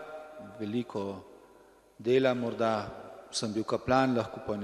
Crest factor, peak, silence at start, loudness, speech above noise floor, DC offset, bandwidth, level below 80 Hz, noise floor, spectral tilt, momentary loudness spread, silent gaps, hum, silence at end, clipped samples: 20 dB; -10 dBFS; 0 s; -31 LUFS; 29 dB; under 0.1%; 12.5 kHz; -62 dBFS; -59 dBFS; -5.5 dB/octave; 18 LU; none; none; 0 s; under 0.1%